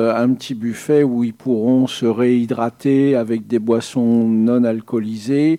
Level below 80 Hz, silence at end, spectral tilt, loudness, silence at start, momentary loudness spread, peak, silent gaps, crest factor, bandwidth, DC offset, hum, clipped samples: -68 dBFS; 0 s; -7 dB/octave; -17 LUFS; 0 s; 7 LU; -4 dBFS; none; 12 dB; 12 kHz; under 0.1%; none; under 0.1%